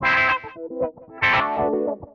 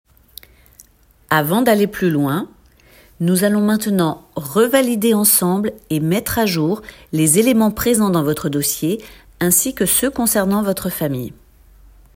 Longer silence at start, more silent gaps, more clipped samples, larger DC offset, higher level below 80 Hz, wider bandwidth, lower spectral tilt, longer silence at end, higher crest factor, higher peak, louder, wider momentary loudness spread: second, 0 s vs 1.3 s; neither; neither; neither; about the same, -50 dBFS vs -46 dBFS; second, 7.6 kHz vs 16.5 kHz; about the same, -5.5 dB/octave vs -4.5 dB/octave; second, 0.1 s vs 0.85 s; about the same, 14 dB vs 18 dB; second, -8 dBFS vs 0 dBFS; second, -21 LUFS vs -17 LUFS; about the same, 11 LU vs 9 LU